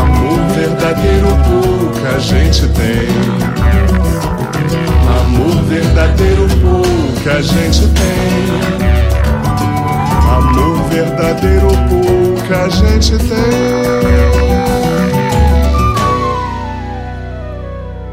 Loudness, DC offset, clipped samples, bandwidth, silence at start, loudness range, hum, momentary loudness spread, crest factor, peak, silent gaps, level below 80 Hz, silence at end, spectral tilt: -12 LUFS; under 0.1%; under 0.1%; 16 kHz; 0 s; 1 LU; none; 6 LU; 10 dB; 0 dBFS; none; -14 dBFS; 0 s; -6.5 dB/octave